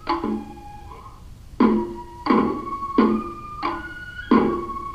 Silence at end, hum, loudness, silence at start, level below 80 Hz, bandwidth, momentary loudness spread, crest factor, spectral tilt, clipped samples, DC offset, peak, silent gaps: 0 s; none; -23 LUFS; 0 s; -44 dBFS; 9 kHz; 21 LU; 20 dB; -7.5 dB/octave; under 0.1%; under 0.1%; -4 dBFS; none